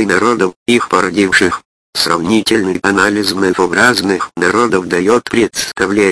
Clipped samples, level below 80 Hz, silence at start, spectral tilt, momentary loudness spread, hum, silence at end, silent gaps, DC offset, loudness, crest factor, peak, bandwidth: 0.2%; -46 dBFS; 0 s; -3.5 dB/octave; 5 LU; none; 0 s; 0.56-0.66 s, 1.65-1.93 s; under 0.1%; -12 LUFS; 12 dB; 0 dBFS; 11 kHz